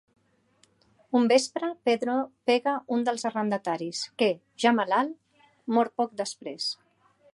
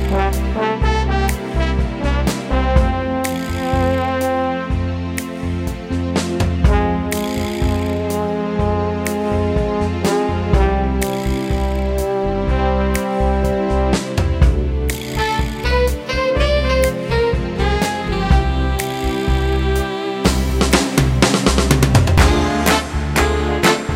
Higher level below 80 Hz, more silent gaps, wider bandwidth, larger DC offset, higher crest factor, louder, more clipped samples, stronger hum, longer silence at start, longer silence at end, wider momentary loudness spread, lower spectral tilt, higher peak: second, -80 dBFS vs -22 dBFS; neither; second, 11.5 kHz vs 16.5 kHz; neither; about the same, 20 dB vs 16 dB; second, -27 LUFS vs -18 LUFS; neither; neither; first, 1.1 s vs 0 s; first, 0.6 s vs 0 s; first, 10 LU vs 6 LU; second, -4 dB/octave vs -5.5 dB/octave; second, -8 dBFS vs 0 dBFS